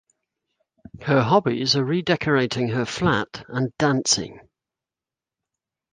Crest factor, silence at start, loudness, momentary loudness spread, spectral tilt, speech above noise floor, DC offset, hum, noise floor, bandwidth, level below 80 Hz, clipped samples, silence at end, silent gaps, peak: 20 dB; 0.95 s; -21 LUFS; 9 LU; -4.5 dB/octave; 68 dB; under 0.1%; none; -90 dBFS; 10 kHz; -54 dBFS; under 0.1%; 1.55 s; none; -4 dBFS